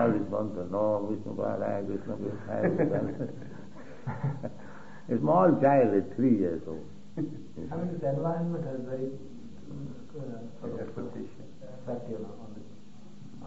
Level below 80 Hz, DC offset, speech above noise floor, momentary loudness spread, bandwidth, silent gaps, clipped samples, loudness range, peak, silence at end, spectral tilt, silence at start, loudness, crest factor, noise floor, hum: -64 dBFS; 0.8%; 21 dB; 22 LU; 8 kHz; none; under 0.1%; 13 LU; -12 dBFS; 0 s; -9.5 dB/octave; 0 s; -30 LUFS; 20 dB; -51 dBFS; none